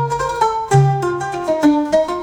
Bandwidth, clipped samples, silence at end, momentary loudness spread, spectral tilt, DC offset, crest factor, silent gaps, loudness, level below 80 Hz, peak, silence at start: 12.5 kHz; under 0.1%; 0 s; 6 LU; -7 dB/octave; under 0.1%; 16 dB; none; -16 LUFS; -44 dBFS; 0 dBFS; 0 s